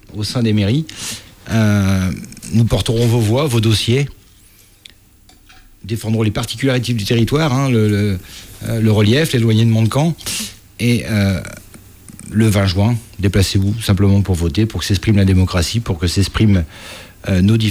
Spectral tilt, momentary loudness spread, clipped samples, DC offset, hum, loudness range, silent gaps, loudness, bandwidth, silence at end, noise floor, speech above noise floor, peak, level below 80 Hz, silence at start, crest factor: -6 dB/octave; 12 LU; under 0.1%; under 0.1%; none; 4 LU; none; -16 LUFS; over 20 kHz; 0 s; -47 dBFS; 32 dB; -4 dBFS; -34 dBFS; 0.1 s; 12 dB